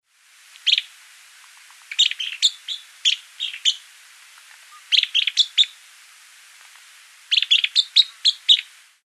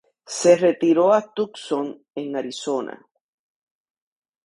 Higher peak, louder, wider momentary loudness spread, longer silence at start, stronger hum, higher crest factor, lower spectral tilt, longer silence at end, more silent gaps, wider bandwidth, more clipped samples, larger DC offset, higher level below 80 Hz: about the same, -2 dBFS vs -2 dBFS; first, -18 LUFS vs -21 LUFS; second, 10 LU vs 15 LU; first, 0.65 s vs 0.3 s; neither; about the same, 22 dB vs 20 dB; second, 10.5 dB/octave vs -4.5 dB/octave; second, 0.4 s vs 1.5 s; neither; first, 15 kHz vs 11.5 kHz; neither; neither; second, under -90 dBFS vs -72 dBFS